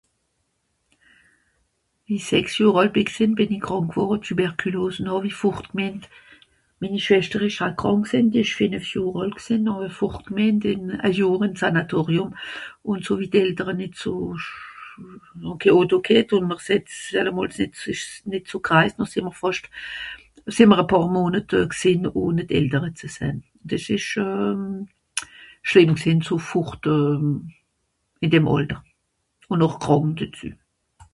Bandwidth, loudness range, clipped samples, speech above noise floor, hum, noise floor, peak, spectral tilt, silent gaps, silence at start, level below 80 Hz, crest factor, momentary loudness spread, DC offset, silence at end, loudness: 11.5 kHz; 4 LU; under 0.1%; 51 dB; none; -73 dBFS; 0 dBFS; -6 dB/octave; none; 2.1 s; -52 dBFS; 22 dB; 14 LU; under 0.1%; 0.6 s; -22 LUFS